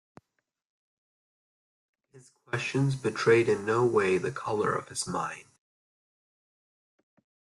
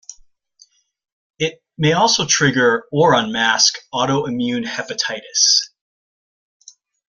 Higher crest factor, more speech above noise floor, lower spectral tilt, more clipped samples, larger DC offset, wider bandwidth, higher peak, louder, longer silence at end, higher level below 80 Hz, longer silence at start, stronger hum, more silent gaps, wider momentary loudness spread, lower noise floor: about the same, 20 dB vs 20 dB; first, 55 dB vs 37 dB; first, -5.5 dB/octave vs -2.5 dB/octave; neither; neither; about the same, 12 kHz vs 11 kHz; second, -12 dBFS vs 0 dBFS; second, -28 LUFS vs -16 LUFS; first, 2.05 s vs 1.4 s; second, -68 dBFS vs -58 dBFS; first, 2.15 s vs 0.1 s; neither; second, none vs 1.12-1.34 s; about the same, 10 LU vs 11 LU; first, -82 dBFS vs -54 dBFS